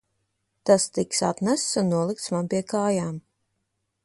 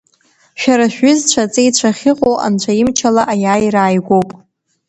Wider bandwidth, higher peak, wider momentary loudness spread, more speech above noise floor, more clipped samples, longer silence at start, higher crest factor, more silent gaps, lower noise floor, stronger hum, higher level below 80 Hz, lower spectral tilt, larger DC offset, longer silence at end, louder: first, 11.5 kHz vs 9.2 kHz; second, -6 dBFS vs 0 dBFS; first, 8 LU vs 4 LU; first, 53 dB vs 42 dB; neither; about the same, 0.65 s vs 0.55 s; first, 20 dB vs 14 dB; neither; first, -77 dBFS vs -54 dBFS; neither; second, -64 dBFS vs -50 dBFS; about the same, -4.5 dB/octave vs -4 dB/octave; neither; first, 0.85 s vs 0.55 s; second, -24 LUFS vs -13 LUFS